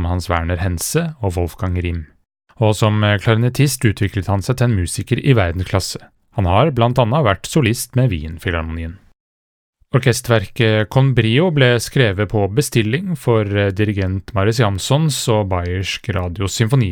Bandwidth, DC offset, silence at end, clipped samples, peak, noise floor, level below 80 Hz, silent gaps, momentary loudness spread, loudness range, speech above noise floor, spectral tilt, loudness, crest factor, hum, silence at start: 18.5 kHz; under 0.1%; 0 s; under 0.1%; 0 dBFS; under -90 dBFS; -40 dBFS; 9.20-9.73 s; 7 LU; 3 LU; over 74 dB; -5.5 dB/octave; -17 LUFS; 16 dB; none; 0 s